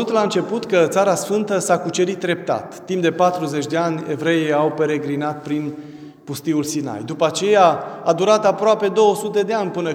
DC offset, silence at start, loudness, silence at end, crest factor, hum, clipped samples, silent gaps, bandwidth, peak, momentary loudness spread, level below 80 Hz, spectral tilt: under 0.1%; 0 s; -19 LUFS; 0 s; 18 dB; none; under 0.1%; none; 17 kHz; 0 dBFS; 10 LU; -68 dBFS; -5 dB/octave